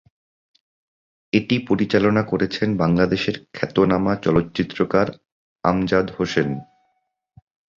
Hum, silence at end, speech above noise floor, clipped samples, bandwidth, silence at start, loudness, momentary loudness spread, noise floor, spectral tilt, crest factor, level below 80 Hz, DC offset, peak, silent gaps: none; 1.15 s; 52 dB; under 0.1%; 7.4 kHz; 1.35 s; -21 LUFS; 7 LU; -72 dBFS; -7 dB/octave; 20 dB; -48 dBFS; under 0.1%; -2 dBFS; 5.32-5.56 s